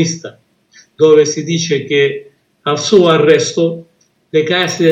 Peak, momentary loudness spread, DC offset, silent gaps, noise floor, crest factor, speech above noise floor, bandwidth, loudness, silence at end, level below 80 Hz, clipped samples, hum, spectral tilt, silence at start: 0 dBFS; 14 LU; under 0.1%; none; -48 dBFS; 14 dB; 36 dB; 8.8 kHz; -12 LUFS; 0 s; -62 dBFS; under 0.1%; none; -4.5 dB/octave; 0 s